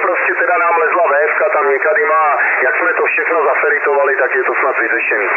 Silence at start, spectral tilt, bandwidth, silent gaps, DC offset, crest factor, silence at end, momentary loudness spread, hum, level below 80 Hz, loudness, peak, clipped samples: 0 s; -4.5 dB/octave; 3 kHz; none; under 0.1%; 10 dB; 0 s; 2 LU; none; under -90 dBFS; -12 LUFS; -2 dBFS; under 0.1%